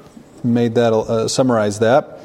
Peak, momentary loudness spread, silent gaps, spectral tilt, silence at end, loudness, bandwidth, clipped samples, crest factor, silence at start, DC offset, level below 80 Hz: -2 dBFS; 4 LU; none; -5.5 dB/octave; 0 s; -16 LUFS; 13.5 kHz; under 0.1%; 14 dB; 0.35 s; under 0.1%; -52 dBFS